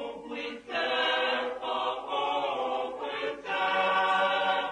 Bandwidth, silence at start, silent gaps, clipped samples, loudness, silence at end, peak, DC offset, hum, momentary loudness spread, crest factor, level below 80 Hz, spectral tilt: 10.5 kHz; 0 s; none; under 0.1%; -29 LUFS; 0 s; -16 dBFS; under 0.1%; none; 9 LU; 14 dB; -70 dBFS; -3 dB/octave